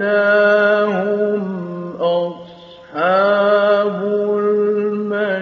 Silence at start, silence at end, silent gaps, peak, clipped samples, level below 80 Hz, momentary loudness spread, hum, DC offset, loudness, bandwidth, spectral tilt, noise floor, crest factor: 0 s; 0 s; none; -2 dBFS; under 0.1%; -68 dBFS; 12 LU; none; under 0.1%; -16 LUFS; 6.4 kHz; -4 dB/octave; -39 dBFS; 14 dB